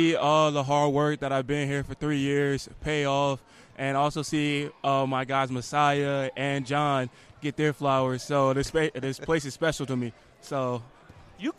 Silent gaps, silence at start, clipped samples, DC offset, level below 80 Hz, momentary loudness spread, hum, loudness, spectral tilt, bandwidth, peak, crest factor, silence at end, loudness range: none; 0 s; under 0.1%; under 0.1%; -54 dBFS; 8 LU; none; -27 LUFS; -5.5 dB/octave; 13.5 kHz; -10 dBFS; 18 dB; 0.05 s; 2 LU